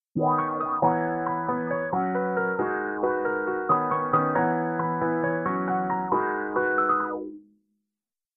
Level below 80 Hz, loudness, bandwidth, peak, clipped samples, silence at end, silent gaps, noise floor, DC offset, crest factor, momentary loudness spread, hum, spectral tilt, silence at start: -64 dBFS; -26 LUFS; 3.6 kHz; -10 dBFS; under 0.1%; 0.95 s; none; -89 dBFS; under 0.1%; 16 dB; 4 LU; none; -8 dB/octave; 0.15 s